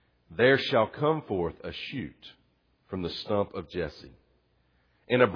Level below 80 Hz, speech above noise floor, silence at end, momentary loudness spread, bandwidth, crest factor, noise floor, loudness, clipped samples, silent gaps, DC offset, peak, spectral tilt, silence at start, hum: -58 dBFS; 41 dB; 0 s; 16 LU; 5.4 kHz; 22 dB; -69 dBFS; -29 LUFS; under 0.1%; none; under 0.1%; -8 dBFS; -7 dB/octave; 0.3 s; none